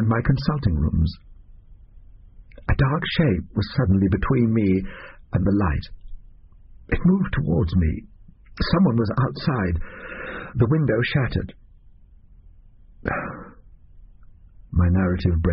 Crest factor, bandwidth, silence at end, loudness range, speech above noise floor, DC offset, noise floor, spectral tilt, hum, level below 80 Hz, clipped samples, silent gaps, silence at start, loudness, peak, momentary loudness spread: 16 dB; 5.8 kHz; 0 s; 6 LU; 28 dB; under 0.1%; -49 dBFS; -7 dB/octave; none; -34 dBFS; under 0.1%; none; 0 s; -22 LUFS; -6 dBFS; 13 LU